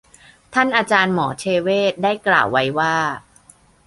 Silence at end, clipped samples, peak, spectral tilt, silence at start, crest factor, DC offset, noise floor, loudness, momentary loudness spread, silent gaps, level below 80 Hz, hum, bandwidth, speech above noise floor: 0.65 s; under 0.1%; -2 dBFS; -4.5 dB/octave; 0.5 s; 18 dB; under 0.1%; -51 dBFS; -18 LUFS; 6 LU; none; -56 dBFS; none; 11.5 kHz; 33 dB